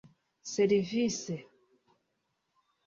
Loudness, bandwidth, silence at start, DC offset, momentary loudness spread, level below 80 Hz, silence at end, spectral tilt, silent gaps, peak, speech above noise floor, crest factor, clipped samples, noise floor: -31 LUFS; 7.6 kHz; 0.45 s; under 0.1%; 14 LU; -72 dBFS; 1.45 s; -5 dB/octave; none; -16 dBFS; 51 dB; 18 dB; under 0.1%; -80 dBFS